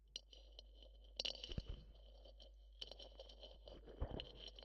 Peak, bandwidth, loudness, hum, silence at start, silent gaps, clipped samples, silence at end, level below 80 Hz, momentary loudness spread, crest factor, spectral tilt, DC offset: -28 dBFS; 10 kHz; -52 LUFS; none; 0 s; none; under 0.1%; 0 s; -58 dBFS; 18 LU; 26 dB; -4 dB/octave; under 0.1%